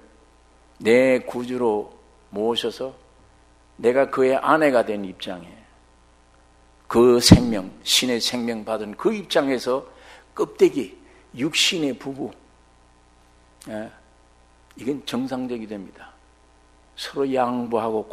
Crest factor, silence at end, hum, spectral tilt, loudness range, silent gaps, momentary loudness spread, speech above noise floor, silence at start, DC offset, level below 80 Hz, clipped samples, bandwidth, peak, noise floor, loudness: 24 dB; 0 s; none; -4.5 dB/octave; 13 LU; none; 18 LU; 34 dB; 0.8 s; under 0.1%; -44 dBFS; under 0.1%; 15.5 kHz; 0 dBFS; -55 dBFS; -21 LUFS